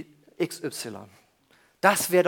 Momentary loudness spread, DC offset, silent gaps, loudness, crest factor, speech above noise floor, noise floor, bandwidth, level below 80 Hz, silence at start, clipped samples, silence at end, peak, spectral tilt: 21 LU; under 0.1%; none; -26 LUFS; 24 dB; 38 dB; -63 dBFS; 19 kHz; -74 dBFS; 0 s; under 0.1%; 0 s; -2 dBFS; -3.5 dB/octave